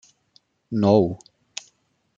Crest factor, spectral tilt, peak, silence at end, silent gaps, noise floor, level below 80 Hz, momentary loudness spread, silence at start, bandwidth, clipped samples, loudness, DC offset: 22 dB; -7 dB/octave; -4 dBFS; 1 s; none; -66 dBFS; -62 dBFS; 19 LU; 0.7 s; 7.6 kHz; under 0.1%; -21 LUFS; under 0.1%